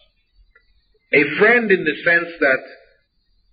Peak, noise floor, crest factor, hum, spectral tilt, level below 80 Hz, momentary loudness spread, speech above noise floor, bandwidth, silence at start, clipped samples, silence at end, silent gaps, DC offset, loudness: -2 dBFS; -63 dBFS; 16 dB; none; -3 dB/octave; -60 dBFS; 5 LU; 47 dB; 5 kHz; 1.1 s; under 0.1%; 0.8 s; none; under 0.1%; -16 LUFS